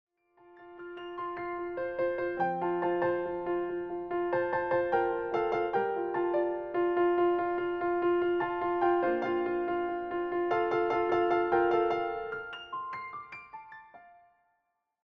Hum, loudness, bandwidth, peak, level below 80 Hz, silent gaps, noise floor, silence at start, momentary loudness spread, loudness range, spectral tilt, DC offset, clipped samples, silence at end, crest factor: none; -31 LUFS; 5.4 kHz; -16 dBFS; -64 dBFS; none; -79 dBFS; 0.5 s; 12 LU; 4 LU; -7.5 dB/octave; under 0.1%; under 0.1%; 0.95 s; 16 dB